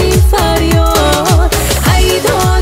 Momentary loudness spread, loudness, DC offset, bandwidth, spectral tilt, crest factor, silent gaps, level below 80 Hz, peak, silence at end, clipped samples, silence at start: 1 LU; -10 LUFS; under 0.1%; 16.5 kHz; -4.5 dB/octave; 10 dB; none; -14 dBFS; 0 dBFS; 0 s; under 0.1%; 0 s